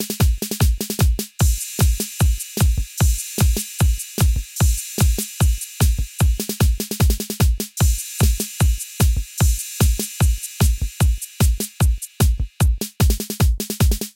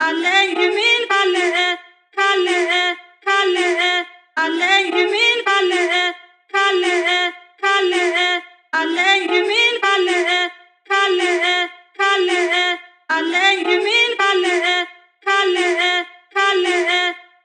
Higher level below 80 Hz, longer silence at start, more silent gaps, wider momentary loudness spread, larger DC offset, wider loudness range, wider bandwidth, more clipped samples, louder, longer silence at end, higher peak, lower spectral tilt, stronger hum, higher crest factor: first, -20 dBFS vs under -90 dBFS; about the same, 0 s vs 0 s; neither; second, 1 LU vs 8 LU; neither; about the same, 1 LU vs 1 LU; first, 17 kHz vs 10 kHz; neither; second, -20 LUFS vs -16 LUFS; second, 0.05 s vs 0.25 s; about the same, -4 dBFS vs -2 dBFS; first, -4.5 dB/octave vs 1 dB/octave; neither; about the same, 14 dB vs 16 dB